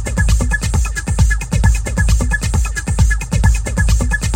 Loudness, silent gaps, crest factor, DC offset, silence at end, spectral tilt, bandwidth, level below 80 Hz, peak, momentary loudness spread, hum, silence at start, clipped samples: -16 LUFS; none; 14 dB; under 0.1%; 0 s; -4.5 dB/octave; 16 kHz; -16 dBFS; 0 dBFS; 3 LU; none; 0 s; under 0.1%